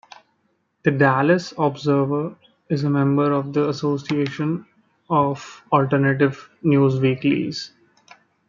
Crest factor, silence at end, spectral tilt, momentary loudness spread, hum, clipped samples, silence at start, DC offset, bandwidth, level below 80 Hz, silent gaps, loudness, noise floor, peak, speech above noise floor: 18 dB; 0.8 s; -7.5 dB/octave; 9 LU; none; under 0.1%; 0.85 s; under 0.1%; 7.4 kHz; -64 dBFS; none; -20 LUFS; -68 dBFS; -2 dBFS; 48 dB